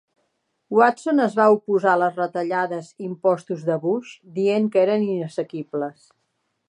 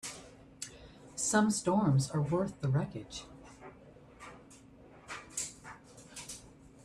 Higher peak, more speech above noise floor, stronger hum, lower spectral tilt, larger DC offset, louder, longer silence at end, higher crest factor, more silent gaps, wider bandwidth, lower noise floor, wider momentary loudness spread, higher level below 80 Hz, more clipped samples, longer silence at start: first, -2 dBFS vs -16 dBFS; first, 52 dB vs 26 dB; neither; first, -7 dB/octave vs -5 dB/octave; neither; first, -21 LUFS vs -33 LUFS; first, 0.8 s vs 0.35 s; about the same, 20 dB vs 20 dB; neither; second, 10.5 kHz vs 13.5 kHz; first, -73 dBFS vs -56 dBFS; second, 11 LU vs 24 LU; second, -76 dBFS vs -62 dBFS; neither; first, 0.7 s vs 0.05 s